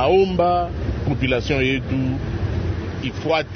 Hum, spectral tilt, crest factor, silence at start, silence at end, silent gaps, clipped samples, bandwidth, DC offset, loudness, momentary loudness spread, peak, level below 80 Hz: none; -7 dB/octave; 14 dB; 0 s; 0 s; none; under 0.1%; 6.6 kHz; under 0.1%; -21 LUFS; 9 LU; -6 dBFS; -32 dBFS